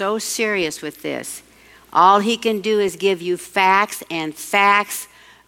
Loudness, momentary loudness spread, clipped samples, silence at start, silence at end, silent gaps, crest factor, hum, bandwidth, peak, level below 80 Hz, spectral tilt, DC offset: -18 LUFS; 14 LU; under 0.1%; 0 s; 0.4 s; none; 18 dB; none; 17 kHz; -2 dBFS; -62 dBFS; -3 dB/octave; under 0.1%